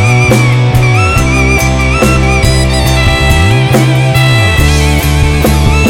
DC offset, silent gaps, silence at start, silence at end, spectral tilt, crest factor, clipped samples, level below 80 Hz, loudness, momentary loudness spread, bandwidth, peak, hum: under 0.1%; none; 0 s; 0 s; -5 dB/octave; 8 dB; 2%; -14 dBFS; -8 LUFS; 2 LU; 17 kHz; 0 dBFS; none